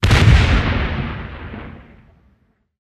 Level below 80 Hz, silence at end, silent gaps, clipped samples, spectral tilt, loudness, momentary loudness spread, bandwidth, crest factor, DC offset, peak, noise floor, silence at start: -22 dBFS; 1.1 s; none; under 0.1%; -6 dB/octave; -16 LUFS; 22 LU; 13 kHz; 16 dB; under 0.1%; 0 dBFS; -59 dBFS; 0 s